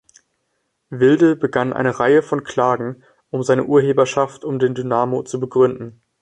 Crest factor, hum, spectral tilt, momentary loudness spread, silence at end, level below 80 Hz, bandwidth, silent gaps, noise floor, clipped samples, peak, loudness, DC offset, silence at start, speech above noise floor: 16 dB; none; -6.5 dB/octave; 9 LU; 0.3 s; -58 dBFS; 9.6 kHz; none; -71 dBFS; under 0.1%; -2 dBFS; -18 LUFS; under 0.1%; 0.9 s; 54 dB